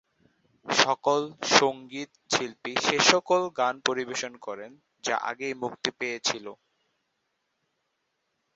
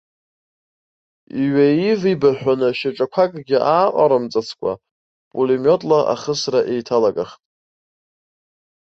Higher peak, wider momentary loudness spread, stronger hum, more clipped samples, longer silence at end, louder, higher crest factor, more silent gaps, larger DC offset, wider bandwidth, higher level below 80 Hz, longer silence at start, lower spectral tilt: about the same, -2 dBFS vs -2 dBFS; first, 17 LU vs 10 LU; neither; neither; first, 2 s vs 1.65 s; second, -26 LUFS vs -18 LUFS; first, 26 dB vs 16 dB; second, none vs 4.91-5.31 s; neither; about the same, 8.2 kHz vs 7.8 kHz; second, -70 dBFS vs -62 dBFS; second, 0.65 s vs 1.35 s; second, -2 dB/octave vs -6 dB/octave